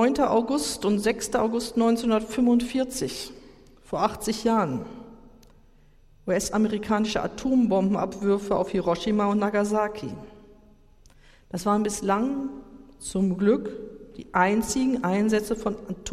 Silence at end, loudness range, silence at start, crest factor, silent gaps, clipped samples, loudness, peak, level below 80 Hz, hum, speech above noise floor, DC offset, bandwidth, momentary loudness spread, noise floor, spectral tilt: 0 s; 5 LU; 0 s; 20 dB; none; under 0.1%; -25 LUFS; -6 dBFS; -50 dBFS; none; 30 dB; under 0.1%; 15 kHz; 14 LU; -55 dBFS; -5 dB/octave